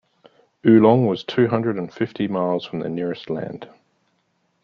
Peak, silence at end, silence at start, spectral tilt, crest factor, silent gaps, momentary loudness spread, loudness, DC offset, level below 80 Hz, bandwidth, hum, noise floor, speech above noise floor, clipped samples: -2 dBFS; 1 s; 0.65 s; -9 dB/octave; 20 dB; none; 15 LU; -20 LUFS; under 0.1%; -62 dBFS; 6.4 kHz; none; -68 dBFS; 48 dB; under 0.1%